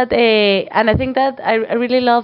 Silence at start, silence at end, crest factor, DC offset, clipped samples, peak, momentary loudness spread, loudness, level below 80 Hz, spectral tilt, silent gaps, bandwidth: 0 s; 0 s; 14 dB; under 0.1%; under 0.1%; 0 dBFS; 5 LU; -15 LUFS; -40 dBFS; -8 dB/octave; none; 5.6 kHz